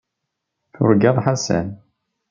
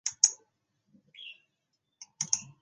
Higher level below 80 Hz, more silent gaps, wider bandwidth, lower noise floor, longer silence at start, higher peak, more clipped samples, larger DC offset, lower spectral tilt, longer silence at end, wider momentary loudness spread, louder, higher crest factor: first, -56 dBFS vs -84 dBFS; neither; second, 7.6 kHz vs 10 kHz; about the same, -79 dBFS vs -81 dBFS; first, 0.8 s vs 0.05 s; about the same, -2 dBFS vs -4 dBFS; neither; neither; first, -6 dB/octave vs 2 dB/octave; first, 0.55 s vs 0.2 s; second, 8 LU vs 22 LU; first, -18 LUFS vs -28 LUFS; second, 18 dB vs 32 dB